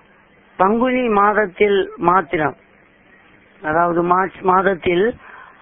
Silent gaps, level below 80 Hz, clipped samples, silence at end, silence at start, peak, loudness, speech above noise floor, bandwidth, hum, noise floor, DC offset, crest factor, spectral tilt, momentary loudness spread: none; -50 dBFS; under 0.1%; 0.2 s; 0.6 s; 0 dBFS; -17 LUFS; 35 dB; 3.8 kHz; none; -51 dBFS; under 0.1%; 18 dB; -10.5 dB/octave; 6 LU